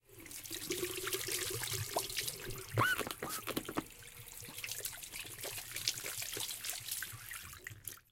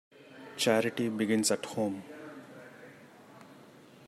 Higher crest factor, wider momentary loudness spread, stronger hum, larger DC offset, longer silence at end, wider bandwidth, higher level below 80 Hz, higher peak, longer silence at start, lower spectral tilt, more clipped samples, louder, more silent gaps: first, 28 dB vs 22 dB; second, 11 LU vs 24 LU; neither; neither; second, 0.1 s vs 0.5 s; first, 17 kHz vs 15 kHz; first, -62 dBFS vs -78 dBFS; about the same, -14 dBFS vs -12 dBFS; about the same, 0.1 s vs 0.2 s; second, -2 dB/octave vs -3.5 dB/octave; neither; second, -39 LUFS vs -30 LUFS; neither